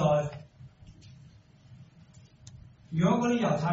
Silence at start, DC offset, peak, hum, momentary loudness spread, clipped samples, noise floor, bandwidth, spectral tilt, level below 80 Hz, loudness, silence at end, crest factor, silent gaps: 0 s; under 0.1%; -12 dBFS; none; 27 LU; under 0.1%; -55 dBFS; 7.6 kHz; -7 dB/octave; -58 dBFS; -28 LUFS; 0 s; 18 dB; none